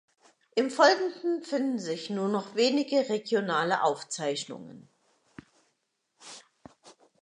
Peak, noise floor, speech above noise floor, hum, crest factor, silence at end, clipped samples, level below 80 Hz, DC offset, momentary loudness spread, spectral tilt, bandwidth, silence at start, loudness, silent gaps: -8 dBFS; -78 dBFS; 50 dB; none; 22 dB; 0.3 s; under 0.1%; -80 dBFS; under 0.1%; 22 LU; -4 dB/octave; 11 kHz; 0.55 s; -28 LUFS; none